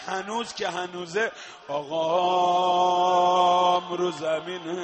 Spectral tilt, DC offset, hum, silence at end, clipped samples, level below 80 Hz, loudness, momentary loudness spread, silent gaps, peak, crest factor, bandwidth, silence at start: -4 dB/octave; under 0.1%; none; 0 s; under 0.1%; -72 dBFS; -24 LUFS; 12 LU; none; -10 dBFS; 14 dB; 8.4 kHz; 0 s